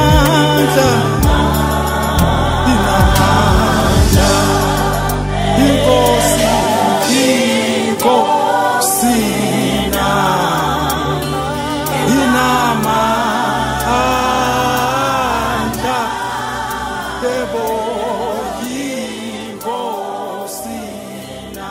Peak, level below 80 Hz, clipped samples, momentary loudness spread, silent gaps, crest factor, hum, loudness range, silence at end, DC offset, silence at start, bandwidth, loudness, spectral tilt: 0 dBFS; -24 dBFS; under 0.1%; 11 LU; none; 14 dB; none; 8 LU; 0 s; under 0.1%; 0 s; 16.5 kHz; -14 LUFS; -4.5 dB/octave